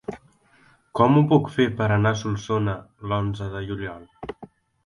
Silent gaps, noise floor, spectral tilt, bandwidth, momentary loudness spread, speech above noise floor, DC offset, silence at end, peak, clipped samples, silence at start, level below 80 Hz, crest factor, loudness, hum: none; -58 dBFS; -7.5 dB/octave; 11 kHz; 20 LU; 36 dB; under 0.1%; 0.4 s; -4 dBFS; under 0.1%; 0.1 s; -48 dBFS; 20 dB; -23 LUFS; none